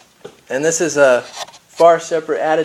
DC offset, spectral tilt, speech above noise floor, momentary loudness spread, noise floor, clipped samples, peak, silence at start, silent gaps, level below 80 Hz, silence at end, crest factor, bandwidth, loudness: under 0.1%; -3 dB/octave; 27 dB; 18 LU; -41 dBFS; under 0.1%; 0 dBFS; 0.25 s; none; -64 dBFS; 0 s; 16 dB; 13.5 kHz; -15 LUFS